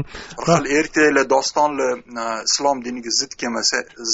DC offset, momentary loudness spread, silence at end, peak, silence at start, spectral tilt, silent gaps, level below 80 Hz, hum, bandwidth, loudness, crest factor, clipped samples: under 0.1%; 10 LU; 0 s; -2 dBFS; 0 s; -2.5 dB/octave; none; -50 dBFS; none; 8 kHz; -19 LUFS; 18 dB; under 0.1%